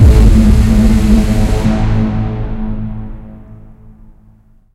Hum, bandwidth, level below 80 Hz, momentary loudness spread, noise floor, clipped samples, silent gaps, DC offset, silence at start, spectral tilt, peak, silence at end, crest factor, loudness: none; 13 kHz; -14 dBFS; 16 LU; -45 dBFS; 0.8%; none; under 0.1%; 0 s; -7.5 dB/octave; 0 dBFS; 0.85 s; 10 dB; -12 LUFS